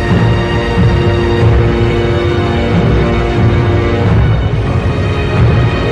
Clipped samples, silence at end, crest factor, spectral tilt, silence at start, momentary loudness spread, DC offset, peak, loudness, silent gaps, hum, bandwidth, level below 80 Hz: under 0.1%; 0 s; 10 dB; -8 dB/octave; 0 s; 3 LU; under 0.1%; 0 dBFS; -12 LUFS; none; none; 8.6 kHz; -18 dBFS